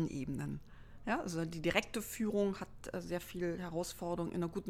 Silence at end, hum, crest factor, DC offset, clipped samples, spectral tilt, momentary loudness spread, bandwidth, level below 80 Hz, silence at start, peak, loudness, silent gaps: 0 s; none; 22 dB; under 0.1%; under 0.1%; -5.5 dB/octave; 10 LU; 16.5 kHz; -58 dBFS; 0 s; -16 dBFS; -39 LUFS; none